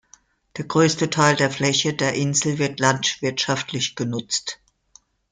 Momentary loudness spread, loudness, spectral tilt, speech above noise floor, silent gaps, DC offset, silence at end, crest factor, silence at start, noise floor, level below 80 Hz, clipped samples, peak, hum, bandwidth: 9 LU; -21 LUFS; -3.5 dB/octave; 35 dB; none; under 0.1%; 0.75 s; 20 dB; 0.55 s; -56 dBFS; -60 dBFS; under 0.1%; -4 dBFS; none; 9.6 kHz